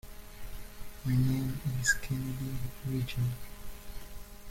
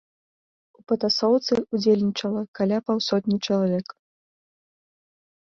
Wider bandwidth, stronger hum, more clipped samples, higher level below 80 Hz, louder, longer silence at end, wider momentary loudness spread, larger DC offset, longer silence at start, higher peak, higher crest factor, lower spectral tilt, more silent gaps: first, 16.5 kHz vs 7.4 kHz; neither; neither; first, -46 dBFS vs -66 dBFS; second, -33 LUFS vs -23 LUFS; second, 0 s vs 1.6 s; first, 20 LU vs 7 LU; neither; second, 0.05 s vs 0.9 s; second, -14 dBFS vs -8 dBFS; about the same, 20 dB vs 16 dB; about the same, -5 dB/octave vs -6 dB/octave; second, none vs 2.48-2.53 s